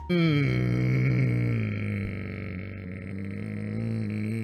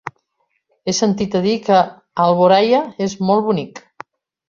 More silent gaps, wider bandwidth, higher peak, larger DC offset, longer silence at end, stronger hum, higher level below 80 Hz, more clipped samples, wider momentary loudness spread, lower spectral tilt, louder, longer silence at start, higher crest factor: neither; first, 9 kHz vs 7.4 kHz; second, -12 dBFS vs -2 dBFS; neither; second, 0 s vs 0.7 s; neither; first, -48 dBFS vs -58 dBFS; neither; about the same, 12 LU vs 14 LU; first, -8.5 dB/octave vs -5 dB/octave; second, -28 LUFS vs -16 LUFS; about the same, 0 s vs 0.05 s; about the same, 16 dB vs 16 dB